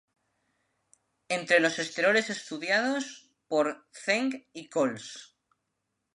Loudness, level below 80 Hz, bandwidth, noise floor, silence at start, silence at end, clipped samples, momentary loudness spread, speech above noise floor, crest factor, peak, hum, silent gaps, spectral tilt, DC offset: -28 LUFS; -84 dBFS; 11.5 kHz; -82 dBFS; 1.3 s; 0.9 s; under 0.1%; 16 LU; 53 dB; 22 dB; -8 dBFS; none; none; -3 dB/octave; under 0.1%